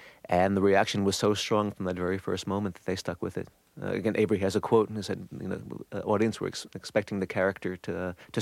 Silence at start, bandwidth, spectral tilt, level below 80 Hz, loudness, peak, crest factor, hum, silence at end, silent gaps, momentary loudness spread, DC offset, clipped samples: 0 s; 15.5 kHz; -5.5 dB/octave; -62 dBFS; -29 LUFS; -10 dBFS; 18 dB; none; 0 s; none; 12 LU; under 0.1%; under 0.1%